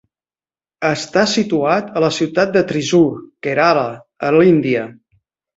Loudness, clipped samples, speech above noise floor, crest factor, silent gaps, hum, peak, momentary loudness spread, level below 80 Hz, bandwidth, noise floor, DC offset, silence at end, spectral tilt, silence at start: -16 LUFS; under 0.1%; over 75 dB; 16 dB; none; none; -2 dBFS; 9 LU; -56 dBFS; 8 kHz; under -90 dBFS; under 0.1%; 0.65 s; -5.5 dB/octave; 0.8 s